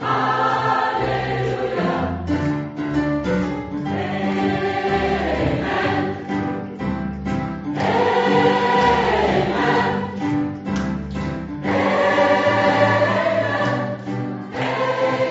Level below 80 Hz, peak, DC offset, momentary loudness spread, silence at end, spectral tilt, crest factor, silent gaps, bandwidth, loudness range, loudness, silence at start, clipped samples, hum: -40 dBFS; -2 dBFS; under 0.1%; 10 LU; 0 s; -4.5 dB/octave; 18 dB; none; 8 kHz; 4 LU; -20 LUFS; 0 s; under 0.1%; none